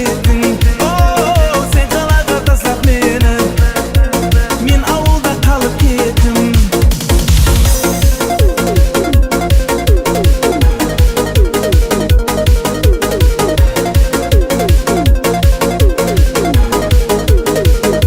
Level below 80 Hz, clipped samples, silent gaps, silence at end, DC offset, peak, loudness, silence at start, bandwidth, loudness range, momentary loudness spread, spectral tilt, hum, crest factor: -12 dBFS; under 0.1%; none; 0 s; under 0.1%; 0 dBFS; -12 LUFS; 0 s; 16.5 kHz; 1 LU; 1 LU; -5.5 dB/octave; none; 10 dB